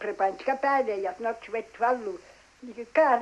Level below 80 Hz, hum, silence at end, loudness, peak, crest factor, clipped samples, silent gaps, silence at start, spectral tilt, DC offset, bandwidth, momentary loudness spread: -68 dBFS; none; 0 s; -28 LUFS; -10 dBFS; 18 dB; under 0.1%; none; 0 s; -4.5 dB/octave; under 0.1%; 11.5 kHz; 18 LU